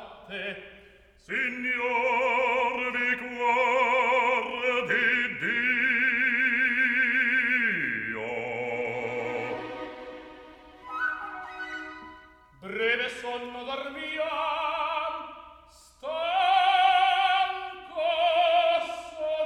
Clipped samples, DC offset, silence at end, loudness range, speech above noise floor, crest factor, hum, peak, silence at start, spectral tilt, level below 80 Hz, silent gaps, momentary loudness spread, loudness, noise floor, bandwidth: under 0.1%; under 0.1%; 0 s; 10 LU; 27 dB; 16 dB; none; -12 dBFS; 0 s; -3.5 dB/octave; -64 dBFS; none; 15 LU; -26 LUFS; -54 dBFS; 11.5 kHz